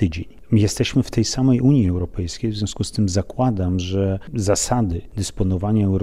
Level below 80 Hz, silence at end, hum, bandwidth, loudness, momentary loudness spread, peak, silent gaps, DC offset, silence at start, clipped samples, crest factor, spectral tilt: -36 dBFS; 0 s; none; 14 kHz; -20 LUFS; 8 LU; -4 dBFS; none; 0.9%; 0 s; under 0.1%; 14 dB; -6 dB/octave